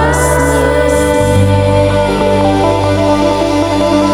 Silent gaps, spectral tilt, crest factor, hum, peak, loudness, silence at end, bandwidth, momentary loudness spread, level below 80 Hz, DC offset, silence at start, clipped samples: none; -5.5 dB/octave; 10 dB; none; 0 dBFS; -11 LUFS; 0 s; over 20 kHz; 2 LU; -24 dBFS; under 0.1%; 0 s; under 0.1%